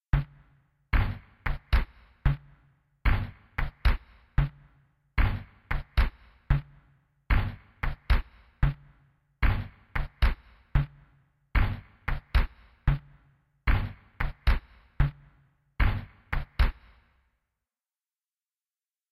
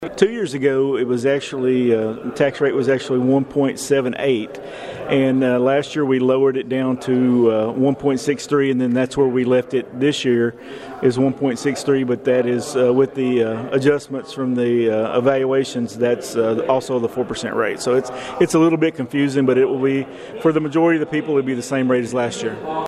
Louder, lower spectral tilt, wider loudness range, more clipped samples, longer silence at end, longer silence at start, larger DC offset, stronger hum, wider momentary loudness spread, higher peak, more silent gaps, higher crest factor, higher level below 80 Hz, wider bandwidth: second, -32 LUFS vs -19 LUFS; first, -7.5 dB/octave vs -6 dB/octave; about the same, 1 LU vs 2 LU; neither; first, 2.4 s vs 0 s; first, 0.15 s vs 0 s; neither; neither; about the same, 7 LU vs 6 LU; second, -10 dBFS vs 0 dBFS; neither; about the same, 20 dB vs 18 dB; first, -30 dBFS vs -58 dBFS; about the same, 13.5 kHz vs 13 kHz